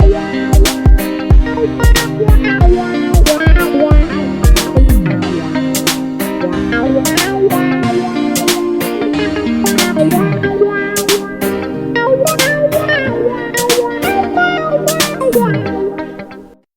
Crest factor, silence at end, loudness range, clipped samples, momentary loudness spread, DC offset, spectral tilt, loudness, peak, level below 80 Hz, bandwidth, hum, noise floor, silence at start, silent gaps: 12 dB; 0.3 s; 2 LU; under 0.1%; 6 LU; under 0.1%; -5 dB/octave; -13 LUFS; 0 dBFS; -16 dBFS; 19 kHz; none; -35 dBFS; 0 s; none